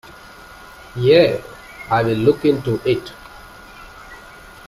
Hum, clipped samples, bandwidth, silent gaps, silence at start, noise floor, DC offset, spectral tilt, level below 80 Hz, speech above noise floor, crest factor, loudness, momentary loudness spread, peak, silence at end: none; under 0.1%; 15 kHz; none; 0.5 s; -40 dBFS; under 0.1%; -7 dB/octave; -48 dBFS; 24 dB; 18 dB; -17 LUFS; 26 LU; 0 dBFS; 0.45 s